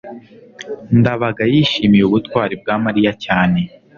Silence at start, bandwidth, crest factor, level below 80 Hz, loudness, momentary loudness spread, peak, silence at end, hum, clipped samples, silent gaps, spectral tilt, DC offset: 0.05 s; 7.2 kHz; 14 dB; -44 dBFS; -15 LUFS; 15 LU; -2 dBFS; 0.3 s; none; under 0.1%; none; -7.5 dB/octave; under 0.1%